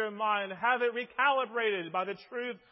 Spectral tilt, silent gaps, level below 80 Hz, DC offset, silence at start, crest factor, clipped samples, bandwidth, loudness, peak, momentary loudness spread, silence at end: -7.5 dB/octave; none; -84 dBFS; under 0.1%; 0 s; 18 dB; under 0.1%; 5.8 kHz; -31 LUFS; -14 dBFS; 10 LU; 0.15 s